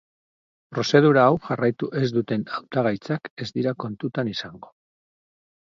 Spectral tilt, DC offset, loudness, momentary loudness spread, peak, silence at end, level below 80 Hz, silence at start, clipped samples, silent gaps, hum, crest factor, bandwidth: -6.5 dB/octave; under 0.1%; -23 LUFS; 13 LU; -2 dBFS; 1.1 s; -64 dBFS; 0.7 s; under 0.1%; 3.30-3.37 s; none; 22 dB; 7.6 kHz